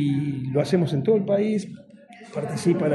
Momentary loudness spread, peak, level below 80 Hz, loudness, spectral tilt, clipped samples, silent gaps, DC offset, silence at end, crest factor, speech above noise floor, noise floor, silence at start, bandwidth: 11 LU; -8 dBFS; -62 dBFS; -24 LUFS; -7.5 dB/octave; under 0.1%; none; under 0.1%; 0 s; 16 dB; 24 dB; -46 dBFS; 0 s; 11.5 kHz